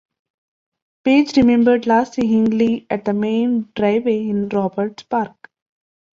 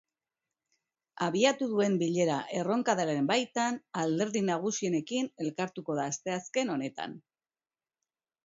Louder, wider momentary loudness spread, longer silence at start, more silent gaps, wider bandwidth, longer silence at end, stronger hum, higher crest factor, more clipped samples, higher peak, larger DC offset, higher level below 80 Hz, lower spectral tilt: first, -17 LUFS vs -31 LUFS; about the same, 9 LU vs 8 LU; about the same, 1.05 s vs 1.15 s; neither; about the same, 7.2 kHz vs 7.8 kHz; second, 0.85 s vs 1.25 s; neither; second, 16 dB vs 22 dB; neither; first, -4 dBFS vs -10 dBFS; neither; first, -54 dBFS vs -78 dBFS; first, -7 dB/octave vs -4.5 dB/octave